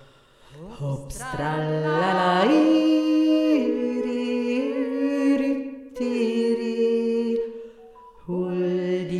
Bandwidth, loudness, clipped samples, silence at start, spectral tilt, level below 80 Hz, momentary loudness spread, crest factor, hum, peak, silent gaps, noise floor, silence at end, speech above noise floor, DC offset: 12 kHz; -23 LUFS; under 0.1%; 0.5 s; -6.5 dB/octave; -52 dBFS; 13 LU; 14 dB; none; -8 dBFS; none; -52 dBFS; 0 s; 30 dB; under 0.1%